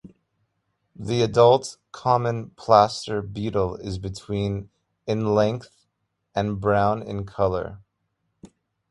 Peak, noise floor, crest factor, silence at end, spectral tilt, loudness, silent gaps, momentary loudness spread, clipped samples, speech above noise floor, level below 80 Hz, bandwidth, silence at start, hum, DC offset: -2 dBFS; -76 dBFS; 22 dB; 0.45 s; -6.5 dB/octave; -23 LUFS; none; 15 LU; under 0.1%; 54 dB; -48 dBFS; 11.5 kHz; 0.05 s; none; under 0.1%